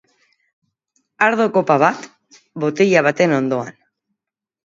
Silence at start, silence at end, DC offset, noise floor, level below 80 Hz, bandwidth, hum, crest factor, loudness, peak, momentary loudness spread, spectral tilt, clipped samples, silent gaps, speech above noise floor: 1.2 s; 1 s; under 0.1%; -84 dBFS; -70 dBFS; 7.8 kHz; none; 20 dB; -16 LUFS; 0 dBFS; 14 LU; -6 dB/octave; under 0.1%; none; 68 dB